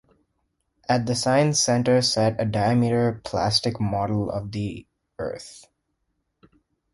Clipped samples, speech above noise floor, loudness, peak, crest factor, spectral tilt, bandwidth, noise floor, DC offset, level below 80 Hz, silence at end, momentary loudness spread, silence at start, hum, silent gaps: under 0.1%; 53 dB; -23 LUFS; -6 dBFS; 18 dB; -4.5 dB/octave; 11.5 kHz; -75 dBFS; under 0.1%; -52 dBFS; 1.35 s; 14 LU; 0.9 s; none; none